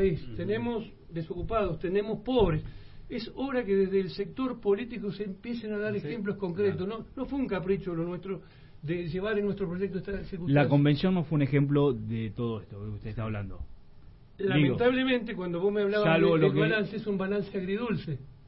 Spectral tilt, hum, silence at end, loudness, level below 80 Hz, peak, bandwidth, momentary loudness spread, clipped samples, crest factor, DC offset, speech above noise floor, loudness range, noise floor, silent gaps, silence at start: -11 dB/octave; none; 0 s; -29 LUFS; -48 dBFS; -10 dBFS; 5.8 kHz; 13 LU; under 0.1%; 18 dB; under 0.1%; 22 dB; 6 LU; -50 dBFS; none; 0 s